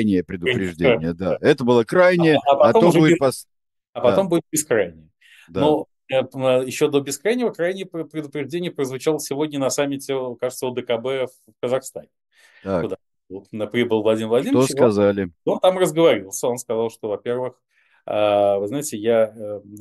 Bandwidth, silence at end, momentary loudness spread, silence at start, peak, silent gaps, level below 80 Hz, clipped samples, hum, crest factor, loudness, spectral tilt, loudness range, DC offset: 13 kHz; 0 s; 14 LU; 0 s; -2 dBFS; 3.89-3.93 s; -58 dBFS; under 0.1%; none; 18 dB; -20 LUFS; -5 dB/octave; 8 LU; under 0.1%